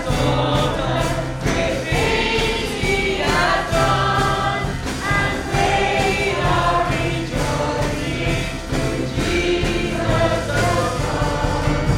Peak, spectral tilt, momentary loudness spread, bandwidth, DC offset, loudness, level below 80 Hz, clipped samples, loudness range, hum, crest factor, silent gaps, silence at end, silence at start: -4 dBFS; -5 dB/octave; 5 LU; 16.5 kHz; under 0.1%; -19 LUFS; -28 dBFS; under 0.1%; 2 LU; none; 14 dB; none; 0 s; 0 s